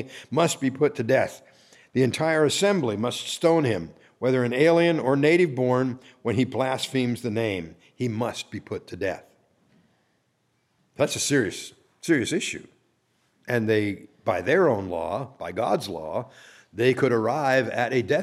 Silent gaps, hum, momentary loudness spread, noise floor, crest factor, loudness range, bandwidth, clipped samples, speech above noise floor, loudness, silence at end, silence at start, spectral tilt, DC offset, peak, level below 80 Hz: none; none; 12 LU; -70 dBFS; 18 dB; 8 LU; 14.5 kHz; under 0.1%; 47 dB; -24 LUFS; 0 s; 0 s; -5 dB/octave; under 0.1%; -6 dBFS; -64 dBFS